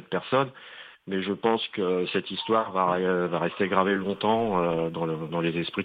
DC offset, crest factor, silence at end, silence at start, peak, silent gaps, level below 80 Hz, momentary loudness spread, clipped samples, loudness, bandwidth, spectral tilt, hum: under 0.1%; 20 dB; 0 s; 0 s; -6 dBFS; none; -60 dBFS; 7 LU; under 0.1%; -26 LUFS; 5 kHz; -8.5 dB/octave; none